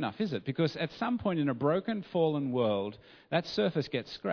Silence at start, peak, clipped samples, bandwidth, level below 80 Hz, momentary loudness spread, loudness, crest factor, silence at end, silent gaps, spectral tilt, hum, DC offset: 0 s; -14 dBFS; under 0.1%; 5.4 kHz; -66 dBFS; 5 LU; -32 LUFS; 18 dB; 0 s; none; -7.5 dB/octave; none; under 0.1%